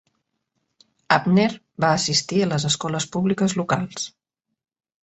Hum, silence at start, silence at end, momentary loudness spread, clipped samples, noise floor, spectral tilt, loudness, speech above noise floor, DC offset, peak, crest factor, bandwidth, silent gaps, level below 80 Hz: none; 1.1 s; 0.95 s; 7 LU; under 0.1%; -82 dBFS; -4.5 dB/octave; -21 LUFS; 61 dB; under 0.1%; -2 dBFS; 22 dB; 8.2 kHz; none; -60 dBFS